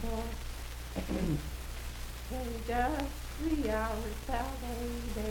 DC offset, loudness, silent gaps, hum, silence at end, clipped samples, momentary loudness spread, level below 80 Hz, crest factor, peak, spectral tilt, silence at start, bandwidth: under 0.1%; -37 LUFS; none; none; 0 s; under 0.1%; 10 LU; -40 dBFS; 18 dB; -18 dBFS; -5.5 dB/octave; 0 s; 19 kHz